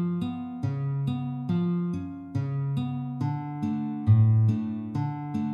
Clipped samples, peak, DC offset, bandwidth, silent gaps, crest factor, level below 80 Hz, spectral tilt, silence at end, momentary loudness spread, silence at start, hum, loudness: under 0.1%; -10 dBFS; under 0.1%; 5.2 kHz; none; 16 dB; -62 dBFS; -10 dB/octave; 0 s; 10 LU; 0 s; none; -28 LUFS